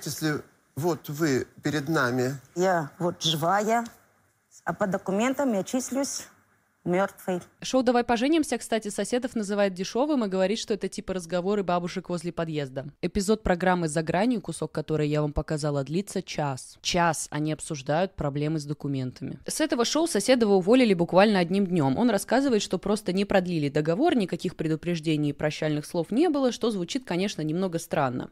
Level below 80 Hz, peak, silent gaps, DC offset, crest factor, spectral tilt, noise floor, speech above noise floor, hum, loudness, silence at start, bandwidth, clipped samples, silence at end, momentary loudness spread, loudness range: -52 dBFS; -6 dBFS; none; under 0.1%; 20 dB; -5 dB/octave; -65 dBFS; 39 dB; none; -26 LUFS; 0 s; 16 kHz; under 0.1%; 0.05 s; 8 LU; 6 LU